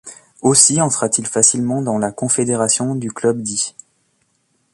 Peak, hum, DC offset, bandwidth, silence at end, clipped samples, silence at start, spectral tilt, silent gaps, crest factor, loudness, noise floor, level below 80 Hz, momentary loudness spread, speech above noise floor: 0 dBFS; none; under 0.1%; 13 kHz; 1.05 s; under 0.1%; 0.05 s; -3.5 dB/octave; none; 18 dB; -15 LUFS; -64 dBFS; -58 dBFS; 10 LU; 48 dB